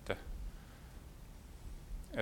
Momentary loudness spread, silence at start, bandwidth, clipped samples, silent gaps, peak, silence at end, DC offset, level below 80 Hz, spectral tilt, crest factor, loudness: 12 LU; 0 s; 17.5 kHz; under 0.1%; none; -18 dBFS; 0 s; under 0.1%; -50 dBFS; -5.5 dB/octave; 26 dB; -50 LUFS